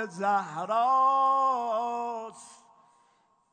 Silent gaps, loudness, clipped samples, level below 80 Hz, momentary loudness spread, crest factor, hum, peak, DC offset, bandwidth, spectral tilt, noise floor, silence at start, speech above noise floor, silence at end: none; -26 LUFS; under 0.1%; -90 dBFS; 12 LU; 14 dB; none; -14 dBFS; under 0.1%; 9.4 kHz; -4.5 dB/octave; -67 dBFS; 0 s; 40 dB; 1 s